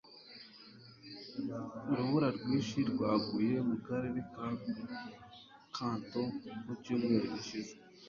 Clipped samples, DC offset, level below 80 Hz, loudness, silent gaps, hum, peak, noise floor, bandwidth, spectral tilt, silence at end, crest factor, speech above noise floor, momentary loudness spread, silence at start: under 0.1%; under 0.1%; -70 dBFS; -37 LUFS; none; none; -20 dBFS; -56 dBFS; 7.4 kHz; -6.5 dB/octave; 0 s; 18 dB; 21 dB; 20 LU; 0.05 s